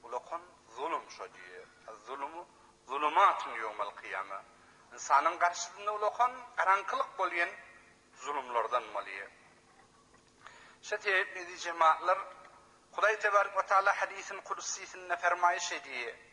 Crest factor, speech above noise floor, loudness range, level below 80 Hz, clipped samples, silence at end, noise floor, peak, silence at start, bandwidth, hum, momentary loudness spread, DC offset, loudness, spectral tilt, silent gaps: 22 dB; 31 dB; 7 LU; -78 dBFS; under 0.1%; 0.15 s; -63 dBFS; -12 dBFS; 0.05 s; 10.5 kHz; none; 19 LU; under 0.1%; -32 LUFS; -0.5 dB/octave; none